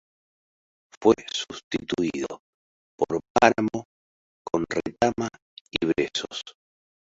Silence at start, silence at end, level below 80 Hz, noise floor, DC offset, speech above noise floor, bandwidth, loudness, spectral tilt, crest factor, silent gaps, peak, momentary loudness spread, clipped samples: 1 s; 0.55 s; -56 dBFS; under -90 dBFS; under 0.1%; over 65 dB; 8 kHz; -26 LUFS; -4.5 dB/octave; 24 dB; 1.64-1.71 s, 2.39-2.98 s, 3.30-3.35 s, 3.85-4.45 s, 5.42-5.65 s; -2 dBFS; 15 LU; under 0.1%